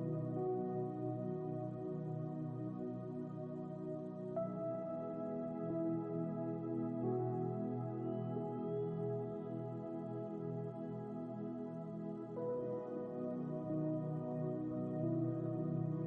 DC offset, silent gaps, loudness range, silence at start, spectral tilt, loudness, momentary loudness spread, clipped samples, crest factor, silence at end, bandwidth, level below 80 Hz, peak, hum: under 0.1%; none; 3 LU; 0 s; -12 dB/octave; -42 LUFS; 6 LU; under 0.1%; 12 dB; 0 s; 3.6 kHz; -76 dBFS; -28 dBFS; none